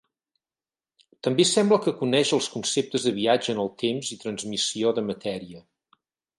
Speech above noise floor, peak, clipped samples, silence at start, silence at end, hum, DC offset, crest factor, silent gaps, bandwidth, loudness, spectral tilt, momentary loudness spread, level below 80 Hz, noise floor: over 66 dB; -8 dBFS; under 0.1%; 1.25 s; 0.8 s; none; under 0.1%; 18 dB; none; 11.5 kHz; -24 LUFS; -3.5 dB/octave; 11 LU; -68 dBFS; under -90 dBFS